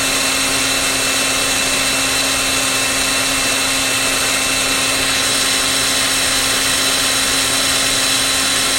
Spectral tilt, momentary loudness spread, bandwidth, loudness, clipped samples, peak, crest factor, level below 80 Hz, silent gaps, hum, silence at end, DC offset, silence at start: -0.5 dB/octave; 1 LU; 16.5 kHz; -13 LUFS; under 0.1%; -2 dBFS; 14 dB; -38 dBFS; none; none; 0 s; under 0.1%; 0 s